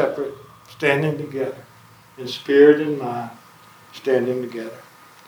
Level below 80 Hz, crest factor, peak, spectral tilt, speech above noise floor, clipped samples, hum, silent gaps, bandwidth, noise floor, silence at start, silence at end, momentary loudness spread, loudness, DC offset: -70 dBFS; 20 dB; -2 dBFS; -6.5 dB/octave; 29 dB; under 0.1%; none; none; 20 kHz; -49 dBFS; 0 s; 0.45 s; 22 LU; -20 LUFS; under 0.1%